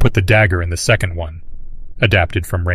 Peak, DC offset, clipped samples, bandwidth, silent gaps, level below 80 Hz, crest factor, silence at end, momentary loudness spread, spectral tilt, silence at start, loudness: 0 dBFS; under 0.1%; under 0.1%; 15 kHz; none; -26 dBFS; 14 dB; 0 s; 11 LU; -5 dB/octave; 0 s; -15 LUFS